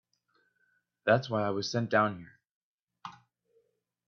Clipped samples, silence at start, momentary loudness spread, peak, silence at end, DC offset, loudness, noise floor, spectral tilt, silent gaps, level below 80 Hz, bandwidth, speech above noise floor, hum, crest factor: under 0.1%; 1.05 s; 21 LU; -12 dBFS; 0.95 s; under 0.1%; -30 LUFS; -75 dBFS; -5.5 dB/octave; 2.51-2.87 s; -74 dBFS; 7.2 kHz; 46 dB; none; 22 dB